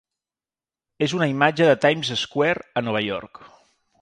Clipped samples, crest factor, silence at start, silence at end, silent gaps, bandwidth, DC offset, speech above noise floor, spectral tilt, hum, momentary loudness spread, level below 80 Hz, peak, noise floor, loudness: under 0.1%; 22 dB; 1 s; 0.55 s; none; 10.5 kHz; under 0.1%; over 69 dB; -5 dB/octave; none; 9 LU; -62 dBFS; -2 dBFS; under -90 dBFS; -21 LUFS